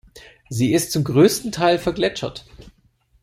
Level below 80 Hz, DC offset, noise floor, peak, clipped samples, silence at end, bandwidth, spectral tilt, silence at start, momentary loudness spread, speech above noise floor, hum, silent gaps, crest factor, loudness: -50 dBFS; under 0.1%; -60 dBFS; -2 dBFS; under 0.1%; 0.55 s; 15.5 kHz; -5 dB/octave; 0.15 s; 15 LU; 41 dB; none; none; 18 dB; -19 LUFS